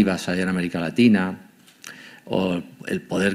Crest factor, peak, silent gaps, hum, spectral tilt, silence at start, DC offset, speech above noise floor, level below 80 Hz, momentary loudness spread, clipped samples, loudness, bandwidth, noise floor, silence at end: 18 dB; -6 dBFS; none; none; -6 dB/octave; 0 s; under 0.1%; 23 dB; -58 dBFS; 22 LU; under 0.1%; -23 LUFS; 15 kHz; -44 dBFS; 0 s